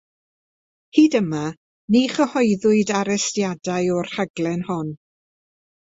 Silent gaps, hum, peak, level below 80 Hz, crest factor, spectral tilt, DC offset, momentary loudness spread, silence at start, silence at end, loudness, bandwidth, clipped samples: 1.57-1.88 s, 4.30-4.34 s; none; -2 dBFS; -62 dBFS; 20 dB; -5 dB/octave; under 0.1%; 10 LU; 0.95 s; 0.9 s; -20 LUFS; 8 kHz; under 0.1%